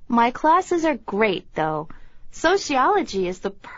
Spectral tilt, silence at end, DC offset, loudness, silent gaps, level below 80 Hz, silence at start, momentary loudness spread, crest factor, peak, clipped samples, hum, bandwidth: -3 dB/octave; 0 s; under 0.1%; -21 LUFS; none; -46 dBFS; 0 s; 9 LU; 16 dB; -6 dBFS; under 0.1%; none; 8 kHz